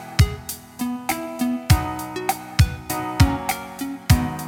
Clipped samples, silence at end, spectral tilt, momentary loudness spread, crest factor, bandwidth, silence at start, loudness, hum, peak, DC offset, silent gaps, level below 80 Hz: under 0.1%; 0 s; -5 dB/octave; 10 LU; 20 dB; 18.5 kHz; 0 s; -23 LUFS; none; -2 dBFS; under 0.1%; none; -30 dBFS